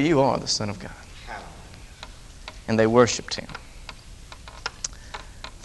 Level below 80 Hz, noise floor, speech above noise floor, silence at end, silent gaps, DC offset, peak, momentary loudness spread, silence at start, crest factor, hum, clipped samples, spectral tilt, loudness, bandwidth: -46 dBFS; -43 dBFS; 21 dB; 0 s; none; under 0.1%; -2 dBFS; 23 LU; 0 s; 24 dB; none; under 0.1%; -4.5 dB/octave; -23 LUFS; 12 kHz